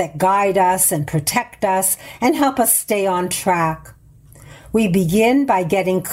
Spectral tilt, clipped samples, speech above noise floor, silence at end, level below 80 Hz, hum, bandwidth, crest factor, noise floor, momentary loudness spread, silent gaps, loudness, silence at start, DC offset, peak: -4 dB/octave; under 0.1%; 28 dB; 0 s; -48 dBFS; none; 16.5 kHz; 14 dB; -45 dBFS; 5 LU; none; -17 LUFS; 0 s; under 0.1%; -4 dBFS